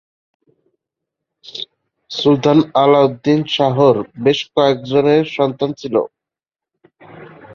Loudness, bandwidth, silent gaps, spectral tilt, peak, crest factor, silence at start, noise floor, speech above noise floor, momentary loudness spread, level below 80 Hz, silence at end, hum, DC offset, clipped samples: -15 LUFS; 7 kHz; none; -6.5 dB/octave; -2 dBFS; 16 dB; 1.45 s; -87 dBFS; 73 dB; 17 LU; -58 dBFS; 0 s; none; under 0.1%; under 0.1%